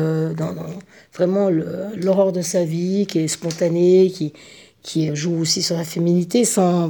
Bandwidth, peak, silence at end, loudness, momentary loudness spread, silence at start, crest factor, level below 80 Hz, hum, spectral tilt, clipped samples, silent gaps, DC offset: over 20 kHz; -4 dBFS; 0 s; -19 LUFS; 12 LU; 0 s; 14 dB; -68 dBFS; none; -5.5 dB/octave; under 0.1%; none; under 0.1%